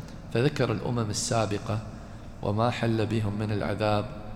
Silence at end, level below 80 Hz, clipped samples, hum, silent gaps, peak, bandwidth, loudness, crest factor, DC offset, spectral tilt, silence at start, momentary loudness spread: 0 s; -48 dBFS; under 0.1%; none; none; -10 dBFS; 13.5 kHz; -28 LUFS; 18 dB; under 0.1%; -5.5 dB/octave; 0 s; 8 LU